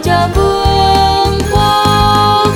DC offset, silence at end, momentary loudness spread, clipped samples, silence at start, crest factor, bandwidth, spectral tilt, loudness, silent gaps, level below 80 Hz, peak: under 0.1%; 0 s; 3 LU; under 0.1%; 0 s; 10 dB; 17.5 kHz; -5 dB/octave; -10 LUFS; none; -20 dBFS; 0 dBFS